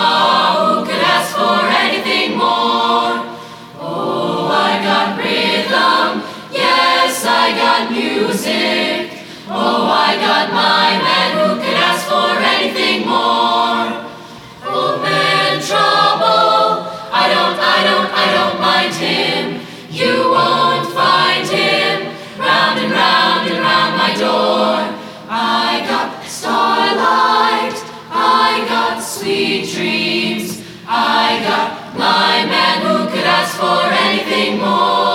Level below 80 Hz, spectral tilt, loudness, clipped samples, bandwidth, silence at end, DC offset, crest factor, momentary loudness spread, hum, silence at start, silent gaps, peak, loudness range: -60 dBFS; -3.5 dB/octave; -14 LUFS; under 0.1%; 17.5 kHz; 0 s; under 0.1%; 14 dB; 10 LU; none; 0 s; none; 0 dBFS; 3 LU